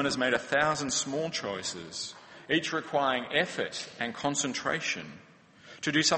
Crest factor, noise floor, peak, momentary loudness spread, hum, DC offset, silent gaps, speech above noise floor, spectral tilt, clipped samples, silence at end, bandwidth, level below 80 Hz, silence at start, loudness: 20 dB; -54 dBFS; -10 dBFS; 10 LU; none; under 0.1%; none; 23 dB; -2.5 dB/octave; under 0.1%; 0 s; 8.8 kHz; -66 dBFS; 0 s; -30 LUFS